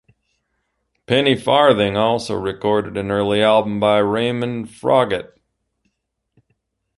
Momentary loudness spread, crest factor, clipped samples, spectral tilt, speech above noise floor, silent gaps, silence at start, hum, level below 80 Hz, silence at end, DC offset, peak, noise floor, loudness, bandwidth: 9 LU; 18 dB; under 0.1%; -6 dB/octave; 57 dB; none; 1.1 s; none; -52 dBFS; 1.7 s; under 0.1%; 0 dBFS; -74 dBFS; -17 LUFS; 11.5 kHz